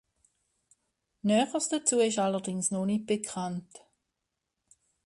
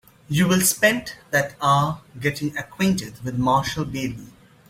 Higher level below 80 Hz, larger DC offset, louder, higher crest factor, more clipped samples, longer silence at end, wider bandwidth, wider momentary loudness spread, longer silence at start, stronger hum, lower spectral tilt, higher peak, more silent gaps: second, -72 dBFS vs -50 dBFS; neither; second, -29 LUFS vs -22 LUFS; about the same, 20 dB vs 20 dB; neither; first, 1.3 s vs 0.4 s; second, 11.5 kHz vs 16.5 kHz; about the same, 9 LU vs 11 LU; first, 1.25 s vs 0.3 s; neither; about the same, -4 dB/octave vs -4 dB/octave; second, -12 dBFS vs -4 dBFS; neither